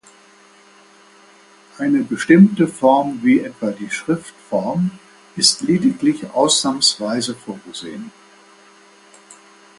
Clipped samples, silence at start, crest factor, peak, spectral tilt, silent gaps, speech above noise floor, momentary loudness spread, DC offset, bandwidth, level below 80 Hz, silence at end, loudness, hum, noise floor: under 0.1%; 1.8 s; 20 dB; 0 dBFS; -4 dB/octave; none; 31 dB; 17 LU; under 0.1%; 11.5 kHz; -62 dBFS; 0.45 s; -17 LUFS; none; -48 dBFS